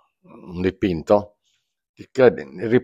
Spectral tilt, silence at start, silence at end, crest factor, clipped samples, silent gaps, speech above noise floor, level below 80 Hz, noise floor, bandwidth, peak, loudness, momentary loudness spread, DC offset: -7.5 dB/octave; 0.45 s; 0 s; 20 dB; under 0.1%; 1.89-1.94 s; 50 dB; -52 dBFS; -70 dBFS; 7.8 kHz; -2 dBFS; -20 LUFS; 15 LU; under 0.1%